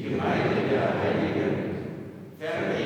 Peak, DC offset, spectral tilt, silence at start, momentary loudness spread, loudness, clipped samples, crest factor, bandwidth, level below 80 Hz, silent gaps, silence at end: -12 dBFS; under 0.1%; -7.5 dB/octave; 0 s; 12 LU; -27 LUFS; under 0.1%; 14 dB; 18.5 kHz; -58 dBFS; none; 0 s